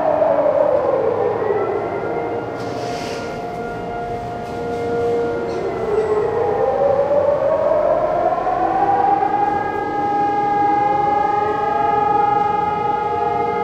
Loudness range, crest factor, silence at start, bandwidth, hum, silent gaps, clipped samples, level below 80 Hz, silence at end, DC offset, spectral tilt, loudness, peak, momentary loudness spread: 6 LU; 14 dB; 0 s; 9.4 kHz; none; none; under 0.1%; -46 dBFS; 0 s; under 0.1%; -6.5 dB/octave; -19 LUFS; -4 dBFS; 9 LU